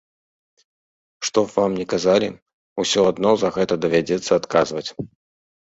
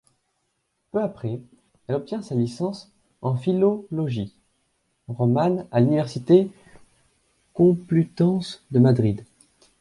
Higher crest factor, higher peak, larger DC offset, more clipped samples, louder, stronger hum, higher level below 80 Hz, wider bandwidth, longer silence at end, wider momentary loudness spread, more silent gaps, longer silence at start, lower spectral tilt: about the same, 20 dB vs 18 dB; about the same, -2 dBFS vs -4 dBFS; neither; neither; first, -20 LUFS vs -23 LUFS; neither; about the same, -56 dBFS vs -58 dBFS; second, 8 kHz vs 11.5 kHz; about the same, 0.7 s vs 0.6 s; second, 11 LU vs 14 LU; first, 2.42-2.46 s, 2.53-2.76 s vs none; first, 1.2 s vs 0.95 s; second, -4.5 dB/octave vs -9 dB/octave